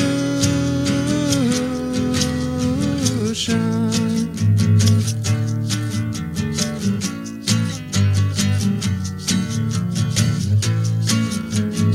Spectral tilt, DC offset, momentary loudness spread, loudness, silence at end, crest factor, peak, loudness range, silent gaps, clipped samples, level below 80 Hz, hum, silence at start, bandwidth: -5 dB/octave; under 0.1%; 4 LU; -20 LUFS; 0 s; 16 dB; -4 dBFS; 2 LU; none; under 0.1%; -42 dBFS; none; 0 s; 15 kHz